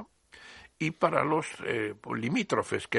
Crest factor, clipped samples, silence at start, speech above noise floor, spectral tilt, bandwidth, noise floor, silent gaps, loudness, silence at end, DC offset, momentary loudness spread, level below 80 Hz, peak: 24 dB; under 0.1%; 0 s; 24 dB; -5.5 dB/octave; 11.5 kHz; -53 dBFS; none; -30 LUFS; 0 s; under 0.1%; 22 LU; -68 dBFS; -8 dBFS